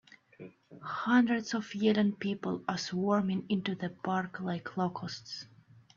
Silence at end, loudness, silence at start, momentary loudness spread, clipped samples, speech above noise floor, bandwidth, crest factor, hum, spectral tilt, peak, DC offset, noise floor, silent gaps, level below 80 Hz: 0.5 s; -32 LUFS; 0.4 s; 18 LU; under 0.1%; 21 dB; 7.4 kHz; 18 dB; none; -6 dB/octave; -14 dBFS; under 0.1%; -53 dBFS; none; -74 dBFS